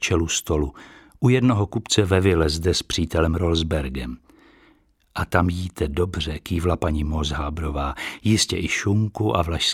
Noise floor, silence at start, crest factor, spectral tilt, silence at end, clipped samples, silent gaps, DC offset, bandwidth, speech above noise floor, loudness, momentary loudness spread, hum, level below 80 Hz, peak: -59 dBFS; 0 s; 22 dB; -5 dB/octave; 0 s; under 0.1%; none; under 0.1%; 15.5 kHz; 37 dB; -22 LUFS; 9 LU; none; -34 dBFS; 0 dBFS